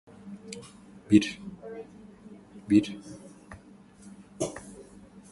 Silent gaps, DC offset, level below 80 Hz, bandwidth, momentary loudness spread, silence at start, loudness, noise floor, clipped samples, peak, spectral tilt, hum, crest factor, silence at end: none; under 0.1%; -60 dBFS; 11.5 kHz; 27 LU; 0.25 s; -27 LUFS; -53 dBFS; under 0.1%; -6 dBFS; -5.5 dB/octave; 50 Hz at -55 dBFS; 24 dB; 0.1 s